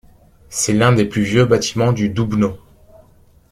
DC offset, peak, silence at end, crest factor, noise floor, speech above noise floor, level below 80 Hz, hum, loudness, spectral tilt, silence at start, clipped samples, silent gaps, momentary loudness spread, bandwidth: under 0.1%; 0 dBFS; 0.9 s; 16 dB; -50 dBFS; 35 dB; -44 dBFS; none; -16 LUFS; -5.5 dB/octave; 0.5 s; under 0.1%; none; 7 LU; 15 kHz